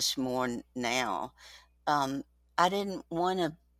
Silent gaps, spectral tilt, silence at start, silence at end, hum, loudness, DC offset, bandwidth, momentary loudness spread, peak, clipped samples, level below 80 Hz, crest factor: none; -3.5 dB/octave; 0 s; 0.25 s; none; -32 LUFS; under 0.1%; 16.5 kHz; 9 LU; -10 dBFS; under 0.1%; -64 dBFS; 22 dB